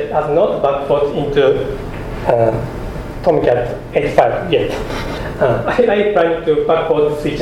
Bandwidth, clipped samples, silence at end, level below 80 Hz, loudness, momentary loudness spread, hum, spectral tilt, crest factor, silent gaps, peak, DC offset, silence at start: 14.5 kHz; under 0.1%; 0 s; -32 dBFS; -15 LUFS; 9 LU; none; -7 dB/octave; 16 dB; none; 0 dBFS; under 0.1%; 0 s